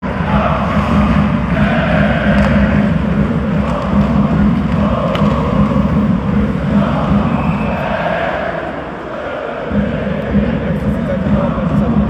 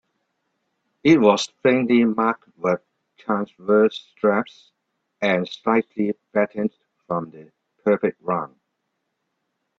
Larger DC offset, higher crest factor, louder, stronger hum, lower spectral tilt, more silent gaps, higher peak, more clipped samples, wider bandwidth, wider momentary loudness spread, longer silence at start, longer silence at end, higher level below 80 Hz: neither; second, 12 dB vs 22 dB; first, -14 LUFS vs -21 LUFS; neither; first, -8.5 dB/octave vs -6 dB/octave; neither; about the same, 0 dBFS vs 0 dBFS; neither; about the same, 8.2 kHz vs 8 kHz; second, 6 LU vs 11 LU; second, 0 s vs 1.05 s; second, 0 s vs 1.35 s; first, -24 dBFS vs -66 dBFS